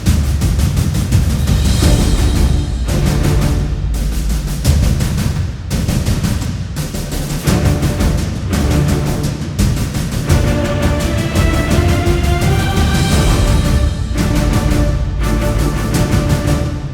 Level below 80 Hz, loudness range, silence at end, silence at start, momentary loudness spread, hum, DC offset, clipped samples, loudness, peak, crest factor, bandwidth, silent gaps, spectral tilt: -18 dBFS; 3 LU; 0 s; 0 s; 6 LU; none; under 0.1%; under 0.1%; -15 LUFS; 0 dBFS; 14 dB; 18.5 kHz; none; -5.5 dB/octave